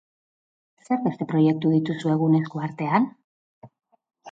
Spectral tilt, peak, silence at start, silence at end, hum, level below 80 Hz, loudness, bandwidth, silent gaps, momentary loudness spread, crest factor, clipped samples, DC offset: -8.5 dB/octave; -6 dBFS; 0.9 s; 0 s; none; -70 dBFS; -23 LUFS; 7.8 kHz; 3.24-3.62 s; 8 LU; 18 dB; under 0.1%; under 0.1%